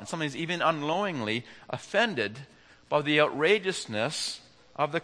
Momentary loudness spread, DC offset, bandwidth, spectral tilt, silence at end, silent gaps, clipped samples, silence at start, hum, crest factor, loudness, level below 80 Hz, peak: 13 LU; under 0.1%; 10.5 kHz; -4 dB/octave; 0 s; none; under 0.1%; 0 s; none; 22 dB; -28 LUFS; -72 dBFS; -8 dBFS